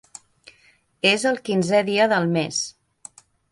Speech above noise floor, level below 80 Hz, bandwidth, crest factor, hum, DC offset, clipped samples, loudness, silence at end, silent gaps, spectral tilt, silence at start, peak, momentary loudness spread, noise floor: 39 dB; -66 dBFS; 11.5 kHz; 20 dB; none; under 0.1%; under 0.1%; -21 LUFS; 0.8 s; none; -4 dB/octave; 1.05 s; -4 dBFS; 7 LU; -59 dBFS